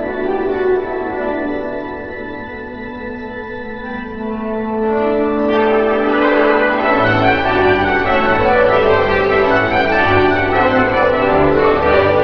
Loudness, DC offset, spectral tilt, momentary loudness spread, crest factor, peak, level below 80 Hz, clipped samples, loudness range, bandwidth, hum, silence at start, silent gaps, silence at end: -14 LUFS; under 0.1%; -7.5 dB/octave; 14 LU; 14 dB; 0 dBFS; -36 dBFS; under 0.1%; 11 LU; 5.4 kHz; none; 0 s; none; 0 s